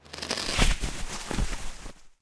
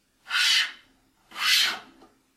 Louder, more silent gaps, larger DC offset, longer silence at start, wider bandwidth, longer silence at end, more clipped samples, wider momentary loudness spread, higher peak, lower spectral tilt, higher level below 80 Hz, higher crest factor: second, -30 LUFS vs -22 LUFS; neither; neither; second, 0.05 s vs 0.25 s; second, 11 kHz vs 16.5 kHz; second, 0.15 s vs 0.55 s; neither; first, 17 LU vs 14 LU; about the same, -8 dBFS vs -8 dBFS; first, -3 dB/octave vs 3.5 dB/octave; first, -32 dBFS vs -72 dBFS; about the same, 20 dB vs 20 dB